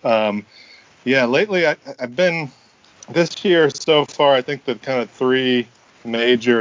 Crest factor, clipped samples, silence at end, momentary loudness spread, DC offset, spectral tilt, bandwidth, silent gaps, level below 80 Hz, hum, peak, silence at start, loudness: 16 dB; under 0.1%; 0 s; 11 LU; under 0.1%; -5 dB/octave; 7.6 kHz; none; -68 dBFS; none; -2 dBFS; 0.05 s; -18 LUFS